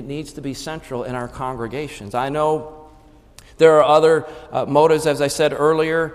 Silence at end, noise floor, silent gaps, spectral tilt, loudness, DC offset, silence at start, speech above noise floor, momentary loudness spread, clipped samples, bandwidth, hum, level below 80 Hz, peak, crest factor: 0 s; -47 dBFS; none; -5 dB/octave; -18 LUFS; under 0.1%; 0 s; 29 dB; 16 LU; under 0.1%; 14.5 kHz; none; -48 dBFS; -2 dBFS; 18 dB